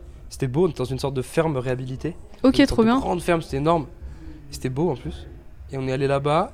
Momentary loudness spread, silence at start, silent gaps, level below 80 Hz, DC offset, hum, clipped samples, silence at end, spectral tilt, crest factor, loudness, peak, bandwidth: 20 LU; 0 s; none; -40 dBFS; under 0.1%; none; under 0.1%; 0 s; -6.5 dB/octave; 20 dB; -23 LUFS; -4 dBFS; 15 kHz